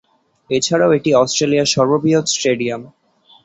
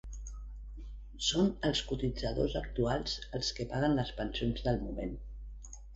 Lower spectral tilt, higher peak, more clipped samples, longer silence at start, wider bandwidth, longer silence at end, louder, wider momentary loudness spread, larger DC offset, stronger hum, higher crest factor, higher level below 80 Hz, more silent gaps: about the same, -4 dB/octave vs -5 dB/octave; first, -2 dBFS vs -18 dBFS; neither; first, 0.5 s vs 0.05 s; about the same, 8.2 kHz vs 8.2 kHz; first, 0.55 s vs 0 s; first, -15 LUFS vs -34 LUFS; second, 7 LU vs 18 LU; neither; neither; about the same, 14 dB vs 18 dB; second, -58 dBFS vs -44 dBFS; neither